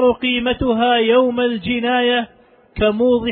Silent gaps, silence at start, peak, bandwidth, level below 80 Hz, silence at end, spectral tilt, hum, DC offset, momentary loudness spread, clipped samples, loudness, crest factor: none; 0 s; -4 dBFS; 4.3 kHz; -40 dBFS; 0 s; -8.5 dB/octave; none; under 0.1%; 6 LU; under 0.1%; -17 LUFS; 12 dB